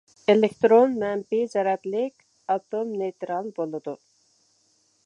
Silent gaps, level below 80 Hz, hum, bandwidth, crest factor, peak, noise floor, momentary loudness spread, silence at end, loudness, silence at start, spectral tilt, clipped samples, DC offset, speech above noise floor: none; -74 dBFS; none; 9.4 kHz; 20 dB; -6 dBFS; -66 dBFS; 14 LU; 1.1 s; -24 LUFS; 0.3 s; -6.5 dB/octave; under 0.1%; under 0.1%; 43 dB